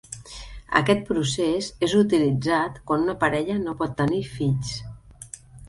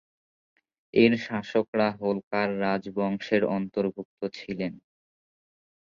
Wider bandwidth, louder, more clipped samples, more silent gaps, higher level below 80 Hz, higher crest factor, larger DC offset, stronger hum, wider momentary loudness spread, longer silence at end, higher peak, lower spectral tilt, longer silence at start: first, 11.5 kHz vs 7.2 kHz; first, -23 LUFS vs -27 LUFS; neither; second, none vs 1.68-1.73 s, 2.23-2.31 s, 4.05-4.17 s; first, -48 dBFS vs -66 dBFS; about the same, 22 dB vs 22 dB; neither; neither; first, 19 LU vs 12 LU; second, 0 s vs 1.2 s; first, -2 dBFS vs -8 dBFS; second, -5.5 dB/octave vs -7 dB/octave; second, 0.1 s vs 0.95 s